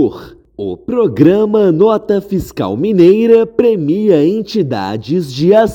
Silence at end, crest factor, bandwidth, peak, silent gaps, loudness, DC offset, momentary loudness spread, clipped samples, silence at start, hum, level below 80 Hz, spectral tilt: 0 s; 12 dB; 17 kHz; 0 dBFS; none; -12 LUFS; under 0.1%; 10 LU; 0.5%; 0 s; none; -44 dBFS; -8 dB/octave